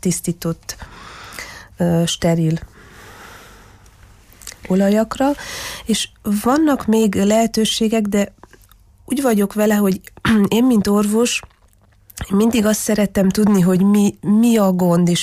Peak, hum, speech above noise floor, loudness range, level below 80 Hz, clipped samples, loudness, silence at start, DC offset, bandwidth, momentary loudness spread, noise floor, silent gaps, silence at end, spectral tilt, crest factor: -6 dBFS; none; 37 dB; 6 LU; -44 dBFS; under 0.1%; -17 LUFS; 0.05 s; under 0.1%; 15.5 kHz; 17 LU; -52 dBFS; none; 0 s; -5.5 dB/octave; 12 dB